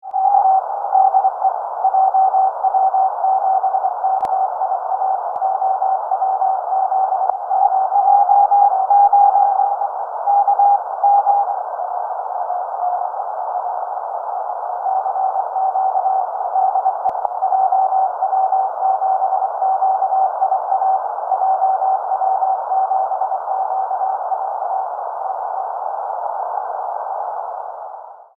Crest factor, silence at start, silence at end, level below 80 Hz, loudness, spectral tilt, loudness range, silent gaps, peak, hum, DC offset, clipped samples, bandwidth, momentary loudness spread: 16 dB; 0.05 s; 0.15 s; -70 dBFS; -18 LUFS; -4.5 dB/octave; 8 LU; none; -2 dBFS; none; under 0.1%; under 0.1%; 1.7 kHz; 10 LU